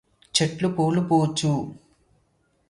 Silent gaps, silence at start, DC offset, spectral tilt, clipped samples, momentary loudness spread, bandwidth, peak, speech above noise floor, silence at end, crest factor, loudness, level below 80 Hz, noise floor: none; 0.35 s; under 0.1%; -5 dB/octave; under 0.1%; 6 LU; 11.5 kHz; -4 dBFS; 44 dB; 0.95 s; 22 dB; -23 LUFS; -60 dBFS; -67 dBFS